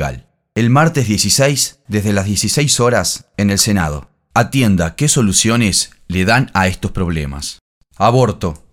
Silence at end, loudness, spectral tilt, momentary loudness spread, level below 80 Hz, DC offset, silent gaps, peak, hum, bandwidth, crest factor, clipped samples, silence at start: 0.15 s; -14 LUFS; -4 dB/octave; 10 LU; -36 dBFS; under 0.1%; 7.61-7.81 s; 0 dBFS; none; 19 kHz; 14 dB; under 0.1%; 0 s